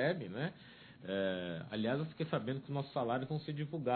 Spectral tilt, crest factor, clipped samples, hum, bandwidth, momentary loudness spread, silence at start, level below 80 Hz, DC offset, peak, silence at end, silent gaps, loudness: -5.5 dB/octave; 18 dB; under 0.1%; none; 4.5 kHz; 6 LU; 0 s; -74 dBFS; under 0.1%; -20 dBFS; 0 s; none; -39 LUFS